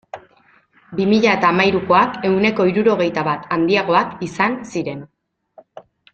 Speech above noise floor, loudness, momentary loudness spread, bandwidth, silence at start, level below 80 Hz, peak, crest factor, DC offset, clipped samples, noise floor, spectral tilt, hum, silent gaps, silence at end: 38 dB; -17 LUFS; 13 LU; 8.4 kHz; 0.15 s; -56 dBFS; -2 dBFS; 16 dB; under 0.1%; under 0.1%; -55 dBFS; -6 dB/octave; none; none; 0.35 s